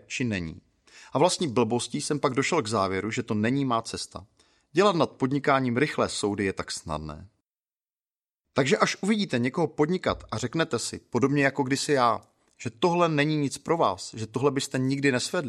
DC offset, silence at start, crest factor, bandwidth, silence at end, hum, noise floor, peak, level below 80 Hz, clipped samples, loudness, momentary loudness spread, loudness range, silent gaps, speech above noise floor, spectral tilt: under 0.1%; 0.1 s; 22 dB; 13 kHz; 0 s; none; under -90 dBFS; -6 dBFS; -58 dBFS; under 0.1%; -26 LUFS; 10 LU; 3 LU; none; over 64 dB; -5 dB/octave